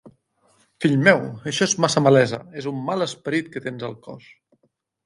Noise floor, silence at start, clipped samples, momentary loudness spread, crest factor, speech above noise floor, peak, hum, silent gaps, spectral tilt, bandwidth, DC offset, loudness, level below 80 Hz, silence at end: -69 dBFS; 0.8 s; under 0.1%; 16 LU; 20 dB; 48 dB; -2 dBFS; none; none; -4.5 dB/octave; 11.5 kHz; under 0.1%; -21 LUFS; -66 dBFS; 0.85 s